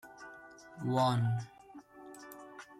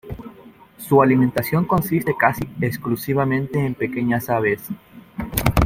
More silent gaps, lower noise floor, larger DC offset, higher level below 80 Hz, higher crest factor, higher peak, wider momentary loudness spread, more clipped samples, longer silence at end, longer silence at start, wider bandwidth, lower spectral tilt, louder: neither; first, -54 dBFS vs -45 dBFS; neither; second, -72 dBFS vs -36 dBFS; about the same, 18 dB vs 20 dB; second, -18 dBFS vs 0 dBFS; first, 23 LU vs 19 LU; neither; about the same, 0.05 s vs 0 s; about the same, 0.05 s vs 0.05 s; second, 14.5 kHz vs 16.5 kHz; about the same, -6.5 dB/octave vs -6.5 dB/octave; second, -33 LUFS vs -20 LUFS